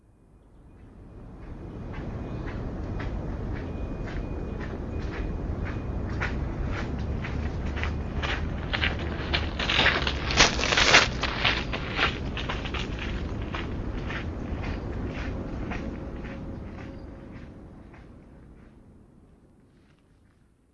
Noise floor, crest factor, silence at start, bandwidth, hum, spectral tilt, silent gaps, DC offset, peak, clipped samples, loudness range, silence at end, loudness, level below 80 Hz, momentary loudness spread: -61 dBFS; 30 dB; 0.35 s; 7.8 kHz; none; -3.5 dB/octave; none; under 0.1%; 0 dBFS; under 0.1%; 16 LU; 1.7 s; -28 LUFS; -36 dBFS; 20 LU